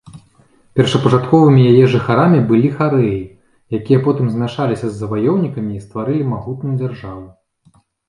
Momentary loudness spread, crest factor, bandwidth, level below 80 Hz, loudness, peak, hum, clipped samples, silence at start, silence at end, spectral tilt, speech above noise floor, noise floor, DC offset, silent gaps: 14 LU; 16 dB; 10.5 kHz; -48 dBFS; -15 LUFS; 0 dBFS; none; under 0.1%; 0.15 s; 0.8 s; -8 dB/octave; 40 dB; -54 dBFS; under 0.1%; none